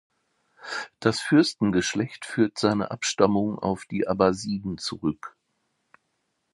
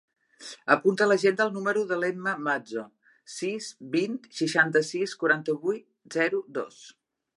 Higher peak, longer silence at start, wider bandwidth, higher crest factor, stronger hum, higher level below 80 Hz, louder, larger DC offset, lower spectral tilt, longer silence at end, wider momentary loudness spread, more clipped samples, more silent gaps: about the same, -4 dBFS vs -4 dBFS; first, 0.6 s vs 0.4 s; about the same, 11.5 kHz vs 11.5 kHz; about the same, 22 dB vs 24 dB; neither; first, -56 dBFS vs -82 dBFS; about the same, -25 LUFS vs -27 LUFS; neither; about the same, -5 dB/octave vs -4.5 dB/octave; first, 1.25 s vs 0.45 s; about the same, 13 LU vs 14 LU; neither; neither